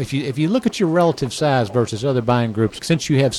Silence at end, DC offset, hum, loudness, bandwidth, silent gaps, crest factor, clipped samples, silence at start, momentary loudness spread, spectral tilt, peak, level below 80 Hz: 0 s; under 0.1%; none; -19 LUFS; 13 kHz; none; 12 dB; under 0.1%; 0 s; 4 LU; -6 dB/octave; -6 dBFS; -50 dBFS